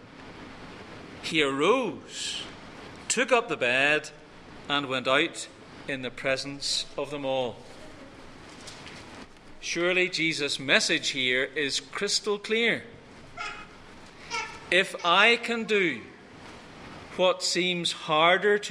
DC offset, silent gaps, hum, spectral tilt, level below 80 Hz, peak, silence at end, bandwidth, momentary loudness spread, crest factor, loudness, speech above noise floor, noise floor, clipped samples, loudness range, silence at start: under 0.1%; none; none; -2.5 dB/octave; -58 dBFS; -4 dBFS; 0 s; 15 kHz; 23 LU; 24 dB; -26 LUFS; 21 dB; -48 dBFS; under 0.1%; 7 LU; 0 s